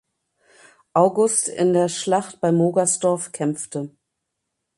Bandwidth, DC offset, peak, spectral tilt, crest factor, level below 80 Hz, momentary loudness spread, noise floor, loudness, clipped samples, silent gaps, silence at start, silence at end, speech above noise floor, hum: 11.5 kHz; under 0.1%; -2 dBFS; -5 dB/octave; 20 dB; -68 dBFS; 10 LU; -79 dBFS; -20 LUFS; under 0.1%; none; 0.95 s; 0.9 s; 59 dB; none